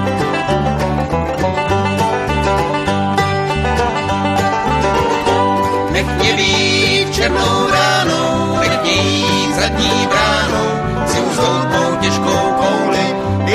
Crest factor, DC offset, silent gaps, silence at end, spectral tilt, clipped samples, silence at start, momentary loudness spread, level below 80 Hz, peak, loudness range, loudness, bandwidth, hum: 14 dB; under 0.1%; none; 0 s; -4.5 dB/octave; under 0.1%; 0 s; 4 LU; -30 dBFS; 0 dBFS; 3 LU; -14 LUFS; 15.5 kHz; none